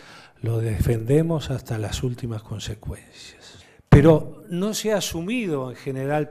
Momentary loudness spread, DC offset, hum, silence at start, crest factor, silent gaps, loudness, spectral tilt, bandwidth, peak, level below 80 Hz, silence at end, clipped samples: 17 LU; under 0.1%; none; 0.1 s; 20 dB; none; -23 LUFS; -6.5 dB/octave; 15.5 kHz; -2 dBFS; -38 dBFS; 0 s; under 0.1%